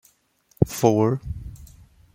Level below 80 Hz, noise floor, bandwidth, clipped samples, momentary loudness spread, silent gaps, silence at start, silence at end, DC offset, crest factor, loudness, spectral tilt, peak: -42 dBFS; -63 dBFS; 16.5 kHz; under 0.1%; 17 LU; none; 0.6 s; 0.5 s; under 0.1%; 22 dB; -22 LUFS; -7 dB/octave; -2 dBFS